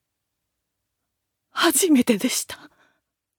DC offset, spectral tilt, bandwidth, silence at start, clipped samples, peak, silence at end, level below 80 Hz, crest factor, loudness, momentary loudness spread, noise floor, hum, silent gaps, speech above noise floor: under 0.1%; -2.5 dB/octave; over 20 kHz; 1.55 s; under 0.1%; -4 dBFS; 0.85 s; -68 dBFS; 20 dB; -20 LUFS; 17 LU; -80 dBFS; none; none; 60 dB